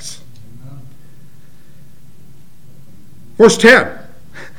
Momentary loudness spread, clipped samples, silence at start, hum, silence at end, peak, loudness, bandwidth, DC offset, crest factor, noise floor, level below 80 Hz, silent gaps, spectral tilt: 29 LU; 0.3%; 0.05 s; none; 0.65 s; 0 dBFS; -9 LUFS; 17 kHz; 3%; 18 dB; -46 dBFS; -50 dBFS; none; -4 dB/octave